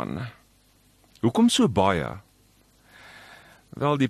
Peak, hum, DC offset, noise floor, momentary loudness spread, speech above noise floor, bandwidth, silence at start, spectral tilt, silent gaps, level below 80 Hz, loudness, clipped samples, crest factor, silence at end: -6 dBFS; none; under 0.1%; -60 dBFS; 26 LU; 38 dB; 13 kHz; 0 s; -5.5 dB/octave; none; -54 dBFS; -23 LUFS; under 0.1%; 20 dB; 0 s